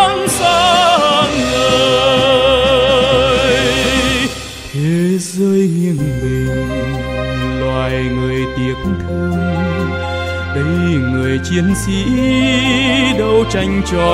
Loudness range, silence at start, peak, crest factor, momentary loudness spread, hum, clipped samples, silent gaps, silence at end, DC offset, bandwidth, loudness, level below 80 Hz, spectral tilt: 7 LU; 0 s; 0 dBFS; 14 dB; 9 LU; none; under 0.1%; none; 0 s; under 0.1%; 15.5 kHz; -14 LUFS; -30 dBFS; -5 dB/octave